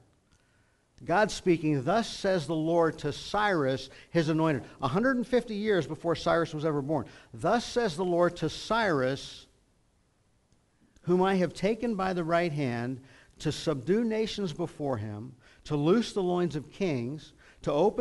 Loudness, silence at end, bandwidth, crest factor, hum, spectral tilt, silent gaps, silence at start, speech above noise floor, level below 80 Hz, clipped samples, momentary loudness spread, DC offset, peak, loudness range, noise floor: -29 LUFS; 0 s; 11.5 kHz; 16 dB; none; -6 dB/octave; none; 1 s; 40 dB; -56 dBFS; under 0.1%; 9 LU; under 0.1%; -12 dBFS; 3 LU; -69 dBFS